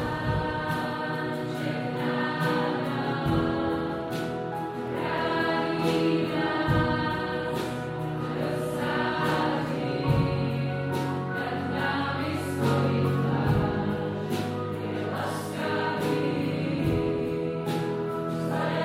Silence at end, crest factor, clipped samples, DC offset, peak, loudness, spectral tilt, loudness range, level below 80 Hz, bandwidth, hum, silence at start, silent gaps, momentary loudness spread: 0 s; 14 dB; under 0.1%; under 0.1%; -12 dBFS; -28 LUFS; -7 dB/octave; 2 LU; -48 dBFS; 16 kHz; none; 0 s; none; 6 LU